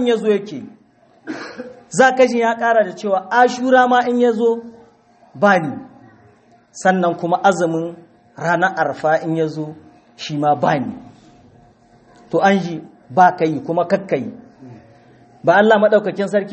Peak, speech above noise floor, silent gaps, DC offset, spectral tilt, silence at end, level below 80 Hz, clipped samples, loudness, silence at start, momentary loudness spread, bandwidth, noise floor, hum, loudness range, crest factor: 0 dBFS; 36 dB; none; under 0.1%; -5.5 dB/octave; 0 s; -64 dBFS; under 0.1%; -16 LUFS; 0 s; 17 LU; 8.4 kHz; -52 dBFS; none; 5 LU; 18 dB